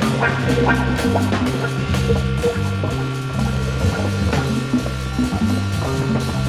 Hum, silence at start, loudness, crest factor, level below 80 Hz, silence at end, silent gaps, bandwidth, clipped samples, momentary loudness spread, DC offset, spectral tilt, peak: none; 0 s; -20 LUFS; 14 dB; -30 dBFS; 0 s; none; 14.5 kHz; under 0.1%; 4 LU; under 0.1%; -6 dB/octave; -4 dBFS